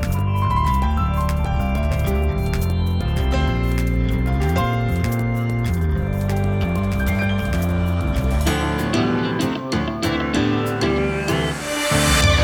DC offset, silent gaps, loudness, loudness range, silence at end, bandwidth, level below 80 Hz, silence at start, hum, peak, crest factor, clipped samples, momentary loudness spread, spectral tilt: under 0.1%; none; -20 LUFS; 0 LU; 0 s; 19.5 kHz; -24 dBFS; 0 s; none; -4 dBFS; 16 dB; under 0.1%; 3 LU; -5.5 dB/octave